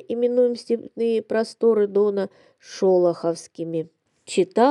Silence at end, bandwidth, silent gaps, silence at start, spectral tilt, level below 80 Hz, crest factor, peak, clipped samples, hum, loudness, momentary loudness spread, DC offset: 0 s; 11 kHz; none; 0.1 s; -6 dB/octave; -82 dBFS; 18 dB; -4 dBFS; under 0.1%; none; -22 LUFS; 12 LU; under 0.1%